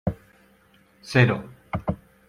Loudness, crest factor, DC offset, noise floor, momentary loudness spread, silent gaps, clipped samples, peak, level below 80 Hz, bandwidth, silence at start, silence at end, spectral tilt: -24 LUFS; 24 dB; under 0.1%; -58 dBFS; 14 LU; none; under 0.1%; -4 dBFS; -48 dBFS; 11.5 kHz; 0.05 s; 0.35 s; -7 dB/octave